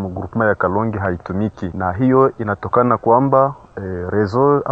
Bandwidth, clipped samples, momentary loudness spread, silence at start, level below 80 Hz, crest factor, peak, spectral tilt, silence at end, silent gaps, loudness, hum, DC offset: 7 kHz; under 0.1%; 9 LU; 0 s; -46 dBFS; 16 dB; 0 dBFS; -10 dB/octave; 0 s; none; -17 LUFS; none; under 0.1%